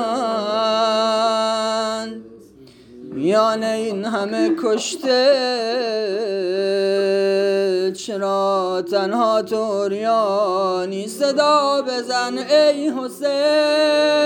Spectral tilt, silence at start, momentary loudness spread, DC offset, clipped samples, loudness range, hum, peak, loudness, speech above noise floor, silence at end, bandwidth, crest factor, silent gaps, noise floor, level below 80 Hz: -4 dB/octave; 0 s; 7 LU; under 0.1%; under 0.1%; 3 LU; none; -4 dBFS; -19 LUFS; 27 dB; 0 s; 18.5 kHz; 16 dB; none; -45 dBFS; -68 dBFS